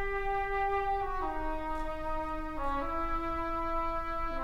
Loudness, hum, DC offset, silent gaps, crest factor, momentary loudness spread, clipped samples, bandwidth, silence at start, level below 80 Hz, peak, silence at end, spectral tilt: -34 LUFS; none; 0.2%; none; 12 dB; 5 LU; under 0.1%; 7.2 kHz; 0 s; -40 dBFS; -20 dBFS; 0 s; -6.5 dB/octave